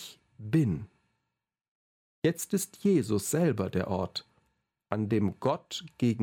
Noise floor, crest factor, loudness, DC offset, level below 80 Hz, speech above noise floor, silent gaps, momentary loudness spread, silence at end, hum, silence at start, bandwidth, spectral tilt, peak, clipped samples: -82 dBFS; 20 dB; -30 LUFS; under 0.1%; -62 dBFS; 54 dB; 1.68-2.22 s; 12 LU; 0 s; none; 0 s; 17 kHz; -6 dB/octave; -10 dBFS; under 0.1%